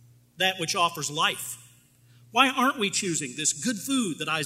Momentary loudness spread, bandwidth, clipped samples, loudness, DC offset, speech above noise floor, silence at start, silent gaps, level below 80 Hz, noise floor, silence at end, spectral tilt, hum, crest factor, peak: 7 LU; 16 kHz; under 0.1%; -25 LUFS; under 0.1%; 31 dB; 0.4 s; none; -72 dBFS; -57 dBFS; 0 s; -2 dB/octave; 60 Hz at -55 dBFS; 24 dB; -4 dBFS